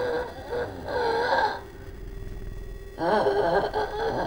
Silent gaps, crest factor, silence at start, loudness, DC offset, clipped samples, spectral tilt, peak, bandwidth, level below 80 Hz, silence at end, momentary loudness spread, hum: none; 16 dB; 0 s; -26 LUFS; under 0.1%; under 0.1%; -5.5 dB/octave; -10 dBFS; over 20 kHz; -42 dBFS; 0 s; 18 LU; none